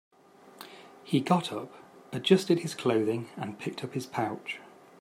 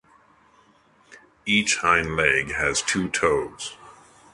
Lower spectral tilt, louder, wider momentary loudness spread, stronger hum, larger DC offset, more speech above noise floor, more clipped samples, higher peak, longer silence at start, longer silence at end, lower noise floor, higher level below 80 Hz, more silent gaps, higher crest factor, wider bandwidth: first, -6 dB/octave vs -2.5 dB/octave; second, -30 LUFS vs -21 LUFS; first, 22 LU vs 14 LU; neither; neither; second, 25 dB vs 35 dB; neither; second, -8 dBFS vs -2 dBFS; second, 0.45 s vs 1.1 s; about the same, 0.35 s vs 0.4 s; second, -54 dBFS vs -58 dBFS; second, -76 dBFS vs -48 dBFS; neither; about the same, 24 dB vs 22 dB; first, 16 kHz vs 11.5 kHz